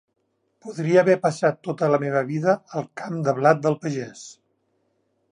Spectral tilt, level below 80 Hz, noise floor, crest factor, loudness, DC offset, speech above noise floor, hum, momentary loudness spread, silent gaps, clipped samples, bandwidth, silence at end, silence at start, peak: -6.5 dB/octave; -74 dBFS; -70 dBFS; 20 dB; -22 LUFS; under 0.1%; 48 dB; none; 18 LU; none; under 0.1%; 10.5 kHz; 1 s; 0.65 s; -4 dBFS